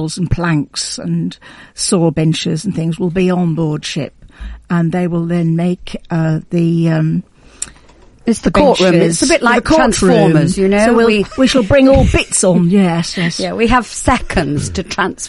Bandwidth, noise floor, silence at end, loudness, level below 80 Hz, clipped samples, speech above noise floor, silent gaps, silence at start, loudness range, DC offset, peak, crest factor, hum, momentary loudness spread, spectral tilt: 11.5 kHz; -43 dBFS; 0 s; -13 LUFS; -30 dBFS; under 0.1%; 30 dB; none; 0 s; 6 LU; under 0.1%; 0 dBFS; 14 dB; none; 11 LU; -5.5 dB/octave